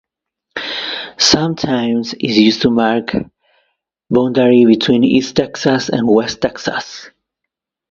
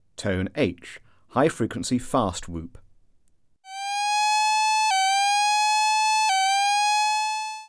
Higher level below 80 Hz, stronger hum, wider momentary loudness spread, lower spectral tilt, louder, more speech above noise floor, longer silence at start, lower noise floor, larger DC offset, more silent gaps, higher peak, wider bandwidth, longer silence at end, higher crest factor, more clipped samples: about the same, -48 dBFS vs -52 dBFS; neither; about the same, 12 LU vs 12 LU; first, -4.5 dB/octave vs -2.5 dB/octave; first, -14 LUFS vs -22 LUFS; first, 66 dB vs 38 dB; first, 0.55 s vs 0.2 s; first, -80 dBFS vs -64 dBFS; neither; neither; first, 0 dBFS vs -8 dBFS; second, 7.8 kHz vs 11 kHz; first, 0.85 s vs 0.05 s; about the same, 16 dB vs 16 dB; neither